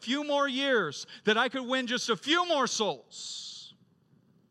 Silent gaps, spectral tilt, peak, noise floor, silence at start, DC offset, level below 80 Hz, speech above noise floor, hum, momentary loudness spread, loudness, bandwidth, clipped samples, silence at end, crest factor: none; -2.5 dB/octave; -12 dBFS; -65 dBFS; 0 s; under 0.1%; -86 dBFS; 36 dB; none; 13 LU; -29 LUFS; 13 kHz; under 0.1%; 0.8 s; 20 dB